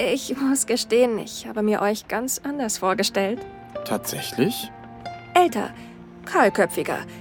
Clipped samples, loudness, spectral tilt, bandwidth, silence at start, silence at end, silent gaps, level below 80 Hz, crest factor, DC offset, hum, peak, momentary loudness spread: under 0.1%; -23 LUFS; -3.5 dB/octave; 19 kHz; 0 s; 0 s; none; -58 dBFS; 18 dB; under 0.1%; none; -4 dBFS; 16 LU